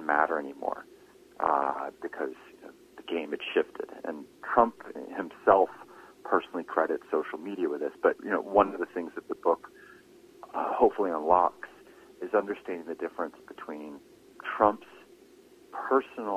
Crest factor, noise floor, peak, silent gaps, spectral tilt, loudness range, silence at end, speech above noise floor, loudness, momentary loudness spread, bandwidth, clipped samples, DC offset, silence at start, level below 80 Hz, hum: 24 dB; -56 dBFS; -6 dBFS; none; -6 dB/octave; 4 LU; 0 s; 27 dB; -29 LUFS; 18 LU; 15 kHz; under 0.1%; under 0.1%; 0 s; -68 dBFS; none